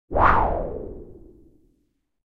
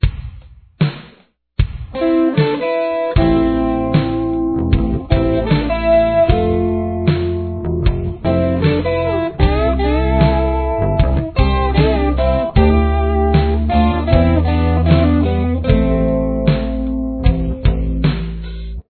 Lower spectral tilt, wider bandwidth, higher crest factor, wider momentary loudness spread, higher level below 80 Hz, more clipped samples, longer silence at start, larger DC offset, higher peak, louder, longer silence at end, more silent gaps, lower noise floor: second, -8.5 dB/octave vs -11.5 dB/octave; first, 5.8 kHz vs 4.5 kHz; first, 22 dB vs 14 dB; first, 21 LU vs 7 LU; second, -34 dBFS vs -20 dBFS; neither; about the same, 0.1 s vs 0 s; neither; second, -4 dBFS vs 0 dBFS; second, -21 LUFS vs -16 LUFS; first, 1.15 s vs 0.1 s; neither; first, -70 dBFS vs -50 dBFS